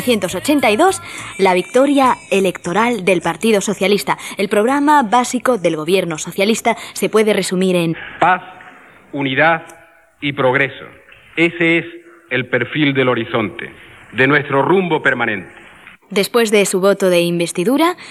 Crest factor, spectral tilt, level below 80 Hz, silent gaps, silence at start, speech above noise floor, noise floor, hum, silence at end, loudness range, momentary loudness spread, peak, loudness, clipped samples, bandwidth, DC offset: 16 dB; -4.5 dB/octave; -56 dBFS; none; 0 s; 26 dB; -42 dBFS; none; 0 s; 3 LU; 9 LU; 0 dBFS; -15 LUFS; under 0.1%; 14.5 kHz; under 0.1%